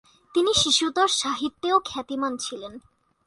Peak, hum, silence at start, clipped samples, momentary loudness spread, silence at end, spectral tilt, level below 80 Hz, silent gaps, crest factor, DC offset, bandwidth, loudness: -6 dBFS; none; 0.35 s; under 0.1%; 13 LU; 0.45 s; -1.5 dB/octave; -56 dBFS; none; 18 dB; under 0.1%; 11.5 kHz; -23 LUFS